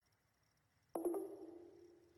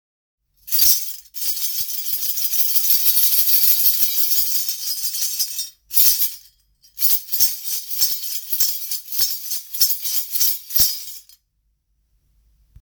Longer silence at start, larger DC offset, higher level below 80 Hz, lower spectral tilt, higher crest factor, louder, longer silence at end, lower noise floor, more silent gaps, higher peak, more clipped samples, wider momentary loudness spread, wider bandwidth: first, 0.95 s vs 0.65 s; neither; second, -88 dBFS vs -54 dBFS; first, -6 dB/octave vs 3 dB/octave; about the same, 20 dB vs 20 dB; second, -47 LUFS vs -16 LUFS; second, 0.1 s vs 1.6 s; first, -80 dBFS vs -68 dBFS; neither; second, -30 dBFS vs 0 dBFS; neither; first, 19 LU vs 10 LU; second, 16 kHz vs over 20 kHz